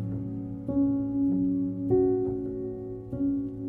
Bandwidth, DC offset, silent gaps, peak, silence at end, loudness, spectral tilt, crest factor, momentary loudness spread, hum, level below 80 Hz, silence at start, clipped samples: 2 kHz; under 0.1%; none; -14 dBFS; 0 s; -29 LUFS; -13 dB/octave; 14 dB; 10 LU; none; -50 dBFS; 0 s; under 0.1%